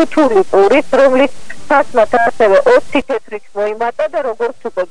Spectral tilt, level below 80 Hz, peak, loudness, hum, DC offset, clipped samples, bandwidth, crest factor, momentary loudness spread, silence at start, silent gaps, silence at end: -4.5 dB/octave; -44 dBFS; 0 dBFS; -13 LUFS; none; 8%; under 0.1%; 11 kHz; 12 dB; 10 LU; 0 s; none; 0 s